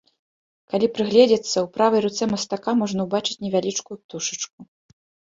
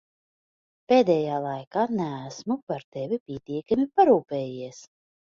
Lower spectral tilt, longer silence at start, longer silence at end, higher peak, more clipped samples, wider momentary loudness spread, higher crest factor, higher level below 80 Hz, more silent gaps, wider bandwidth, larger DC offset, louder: second, -4 dB/octave vs -6.5 dB/octave; second, 0.75 s vs 0.9 s; first, 0.75 s vs 0.55 s; first, -2 dBFS vs -6 dBFS; neither; about the same, 12 LU vs 14 LU; about the same, 20 dB vs 20 dB; about the same, -64 dBFS vs -66 dBFS; second, 4.04-4.09 s, 4.53-4.58 s vs 1.67-1.71 s, 2.63-2.67 s, 2.84-2.92 s, 3.20-3.26 s; about the same, 7.8 kHz vs 7.4 kHz; neither; first, -22 LUFS vs -25 LUFS